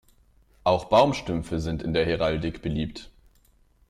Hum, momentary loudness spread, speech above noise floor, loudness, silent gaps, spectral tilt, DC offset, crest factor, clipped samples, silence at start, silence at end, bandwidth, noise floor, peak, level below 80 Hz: none; 10 LU; 36 dB; -25 LUFS; none; -6.5 dB/octave; under 0.1%; 20 dB; under 0.1%; 0.65 s; 0.85 s; 13.5 kHz; -61 dBFS; -6 dBFS; -44 dBFS